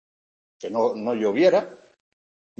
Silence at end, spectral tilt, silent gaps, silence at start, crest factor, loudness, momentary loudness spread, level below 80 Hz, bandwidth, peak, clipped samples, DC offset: 0.85 s; -6 dB/octave; none; 0.6 s; 18 dB; -22 LUFS; 16 LU; -74 dBFS; 7.4 kHz; -6 dBFS; under 0.1%; under 0.1%